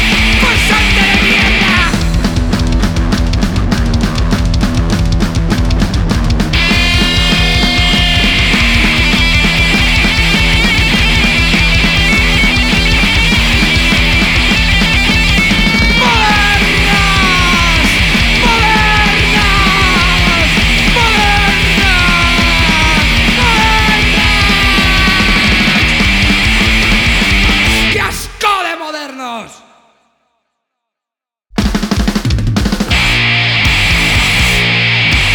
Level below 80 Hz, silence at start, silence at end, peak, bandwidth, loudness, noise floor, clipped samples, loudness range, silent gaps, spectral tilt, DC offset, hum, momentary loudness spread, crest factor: -16 dBFS; 0 s; 0 s; 0 dBFS; 19 kHz; -9 LUFS; -86 dBFS; under 0.1%; 5 LU; none; -4 dB/octave; under 0.1%; none; 6 LU; 10 dB